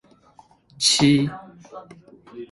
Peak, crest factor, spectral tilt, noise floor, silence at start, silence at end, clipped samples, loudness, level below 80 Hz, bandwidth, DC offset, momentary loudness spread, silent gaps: -4 dBFS; 20 dB; -3.5 dB/octave; -54 dBFS; 0.8 s; 0.05 s; under 0.1%; -18 LUFS; -58 dBFS; 11.5 kHz; under 0.1%; 26 LU; none